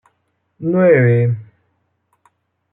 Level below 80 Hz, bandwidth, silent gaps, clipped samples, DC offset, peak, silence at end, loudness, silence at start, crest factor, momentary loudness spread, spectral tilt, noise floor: -64 dBFS; 3.7 kHz; none; under 0.1%; under 0.1%; -2 dBFS; 1.3 s; -15 LUFS; 0.6 s; 16 dB; 15 LU; -12 dB/octave; -67 dBFS